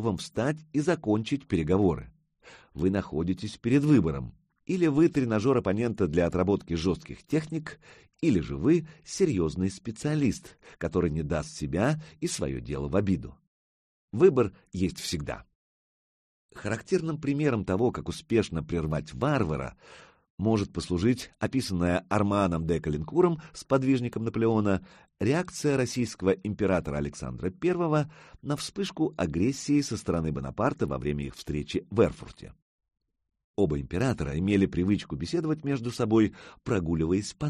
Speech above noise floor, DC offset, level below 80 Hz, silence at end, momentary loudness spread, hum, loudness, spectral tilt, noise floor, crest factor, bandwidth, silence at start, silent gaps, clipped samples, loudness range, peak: over 63 dB; under 0.1%; -48 dBFS; 0 s; 9 LU; none; -28 LUFS; -6.5 dB/octave; under -90 dBFS; 20 dB; 13 kHz; 0 s; 13.47-14.08 s, 15.55-16.49 s, 20.30-20.38 s, 32.62-32.79 s, 33.44-33.54 s; under 0.1%; 4 LU; -8 dBFS